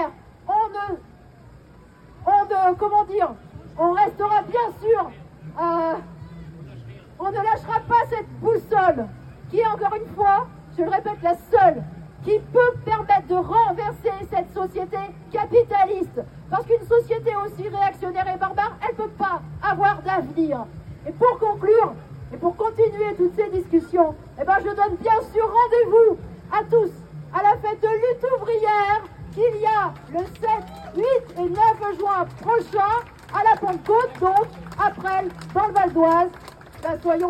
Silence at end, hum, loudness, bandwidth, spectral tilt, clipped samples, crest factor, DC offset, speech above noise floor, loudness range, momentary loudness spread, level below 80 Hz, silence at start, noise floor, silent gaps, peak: 0 s; none; -21 LUFS; 13 kHz; -7.5 dB/octave; under 0.1%; 16 dB; under 0.1%; 27 dB; 4 LU; 12 LU; -48 dBFS; 0 s; -48 dBFS; none; -4 dBFS